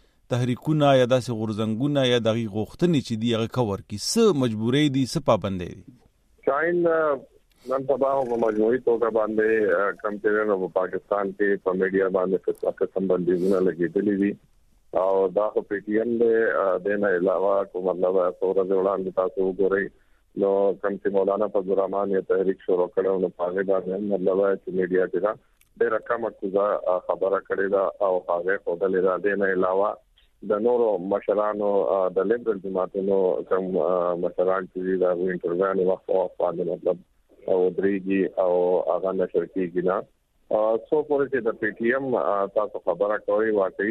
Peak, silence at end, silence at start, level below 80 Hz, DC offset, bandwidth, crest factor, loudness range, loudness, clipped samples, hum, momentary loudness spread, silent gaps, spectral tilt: -6 dBFS; 0 s; 0.3 s; -60 dBFS; under 0.1%; 13.5 kHz; 16 dB; 2 LU; -24 LUFS; under 0.1%; none; 6 LU; none; -6 dB/octave